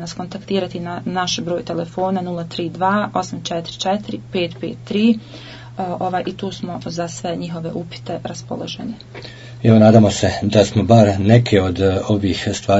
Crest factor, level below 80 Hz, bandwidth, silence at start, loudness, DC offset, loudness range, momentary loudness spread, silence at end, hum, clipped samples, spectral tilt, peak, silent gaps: 18 dB; -50 dBFS; 8 kHz; 0 s; -18 LUFS; under 0.1%; 11 LU; 16 LU; 0 s; none; under 0.1%; -6 dB/octave; 0 dBFS; none